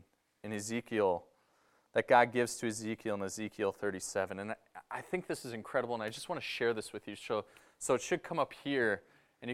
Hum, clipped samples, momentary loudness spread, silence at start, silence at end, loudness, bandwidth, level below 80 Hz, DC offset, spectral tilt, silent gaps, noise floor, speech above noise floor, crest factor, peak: none; under 0.1%; 11 LU; 0.45 s; 0 s; -35 LUFS; 15.5 kHz; -74 dBFS; under 0.1%; -4 dB/octave; none; -71 dBFS; 37 dB; 24 dB; -12 dBFS